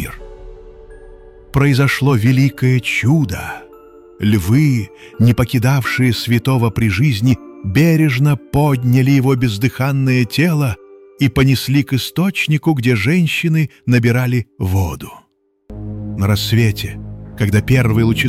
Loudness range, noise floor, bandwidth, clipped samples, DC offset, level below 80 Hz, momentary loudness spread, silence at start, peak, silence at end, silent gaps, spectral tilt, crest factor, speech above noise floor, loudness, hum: 3 LU; -41 dBFS; 16 kHz; under 0.1%; under 0.1%; -38 dBFS; 11 LU; 0 s; -2 dBFS; 0 s; none; -6.5 dB/octave; 12 dB; 27 dB; -15 LUFS; none